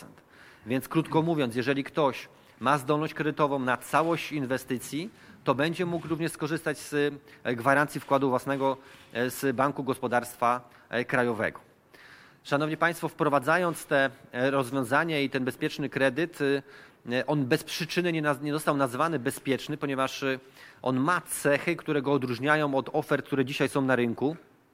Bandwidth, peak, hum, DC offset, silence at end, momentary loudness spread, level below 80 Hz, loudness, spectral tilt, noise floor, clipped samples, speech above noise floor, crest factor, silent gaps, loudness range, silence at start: 16 kHz; -8 dBFS; none; under 0.1%; 0.35 s; 7 LU; -68 dBFS; -28 LUFS; -5.5 dB/octave; -54 dBFS; under 0.1%; 26 dB; 20 dB; none; 2 LU; 0 s